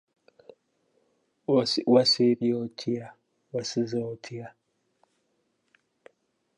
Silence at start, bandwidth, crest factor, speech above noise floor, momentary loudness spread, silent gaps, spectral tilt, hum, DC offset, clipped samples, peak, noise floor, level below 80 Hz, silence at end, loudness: 1.5 s; 10.5 kHz; 22 dB; 49 dB; 19 LU; none; -5 dB/octave; none; under 0.1%; under 0.1%; -8 dBFS; -74 dBFS; -76 dBFS; 2.1 s; -26 LUFS